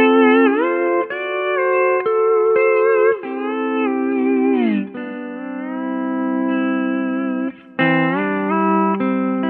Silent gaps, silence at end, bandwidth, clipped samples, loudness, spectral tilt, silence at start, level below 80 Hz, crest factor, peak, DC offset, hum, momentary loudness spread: none; 0 s; 4.2 kHz; under 0.1%; -18 LUFS; -10 dB/octave; 0 s; -72 dBFS; 16 dB; 0 dBFS; under 0.1%; none; 10 LU